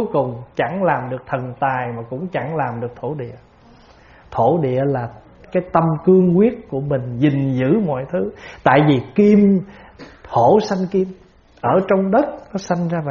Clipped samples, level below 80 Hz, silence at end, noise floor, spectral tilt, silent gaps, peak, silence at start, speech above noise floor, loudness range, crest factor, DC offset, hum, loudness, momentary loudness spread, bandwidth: under 0.1%; -50 dBFS; 0 s; -47 dBFS; -7 dB/octave; none; 0 dBFS; 0 s; 30 dB; 6 LU; 18 dB; under 0.1%; none; -18 LUFS; 13 LU; 7 kHz